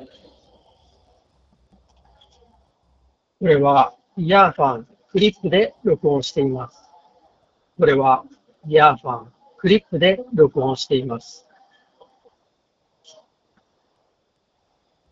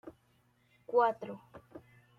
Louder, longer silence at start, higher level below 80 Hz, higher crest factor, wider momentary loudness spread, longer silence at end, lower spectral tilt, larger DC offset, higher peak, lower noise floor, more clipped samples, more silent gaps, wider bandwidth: first, -18 LUFS vs -32 LUFS; about the same, 0 s vs 0.05 s; first, -56 dBFS vs -76 dBFS; about the same, 22 dB vs 20 dB; second, 15 LU vs 26 LU; first, 3.8 s vs 0.4 s; about the same, -6 dB/octave vs -6.5 dB/octave; neither; first, 0 dBFS vs -16 dBFS; about the same, -69 dBFS vs -71 dBFS; neither; neither; first, 7.6 kHz vs 5.6 kHz